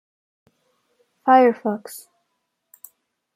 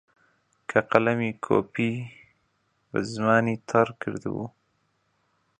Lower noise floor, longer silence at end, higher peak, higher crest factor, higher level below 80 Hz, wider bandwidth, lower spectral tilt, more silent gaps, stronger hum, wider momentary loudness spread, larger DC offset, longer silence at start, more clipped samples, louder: first, -75 dBFS vs -71 dBFS; first, 1.35 s vs 1.1 s; about the same, -2 dBFS vs 0 dBFS; second, 20 dB vs 26 dB; second, -80 dBFS vs -64 dBFS; first, 16 kHz vs 9.6 kHz; second, -5.5 dB/octave vs -7 dB/octave; neither; neither; first, 24 LU vs 13 LU; neither; first, 1.25 s vs 0.7 s; neither; first, -18 LUFS vs -26 LUFS